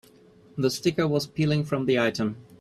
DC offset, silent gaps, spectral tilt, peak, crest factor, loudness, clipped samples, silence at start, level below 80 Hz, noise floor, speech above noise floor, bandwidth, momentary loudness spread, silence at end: under 0.1%; none; -6 dB/octave; -10 dBFS; 16 dB; -25 LUFS; under 0.1%; 0.55 s; -60 dBFS; -54 dBFS; 29 dB; 13.5 kHz; 7 LU; 0.2 s